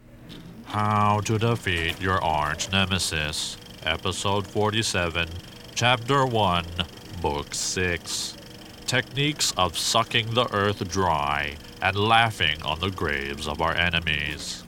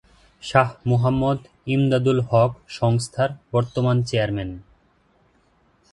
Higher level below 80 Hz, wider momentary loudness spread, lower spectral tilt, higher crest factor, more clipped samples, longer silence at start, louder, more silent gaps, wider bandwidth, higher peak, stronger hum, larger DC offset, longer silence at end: about the same, -44 dBFS vs -48 dBFS; about the same, 10 LU vs 8 LU; second, -3.5 dB/octave vs -7 dB/octave; about the same, 22 dB vs 22 dB; neither; second, 0.1 s vs 0.45 s; second, -24 LUFS vs -21 LUFS; neither; first, 18.5 kHz vs 11.5 kHz; about the same, -2 dBFS vs 0 dBFS; neither; neither; second, 0 s vs 1.3 s